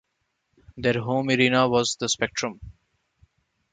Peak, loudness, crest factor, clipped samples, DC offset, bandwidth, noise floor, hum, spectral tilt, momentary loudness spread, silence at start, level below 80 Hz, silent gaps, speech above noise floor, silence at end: -6 dBFS; -23 LUFS; 20 dB; under 0.1%; under 0.1%; 9.6 kHz; -76 dBFS; none; -4 dB/octave; 9 LU; 0.75 s; -56 dBFS; none; 53 dB; 1 s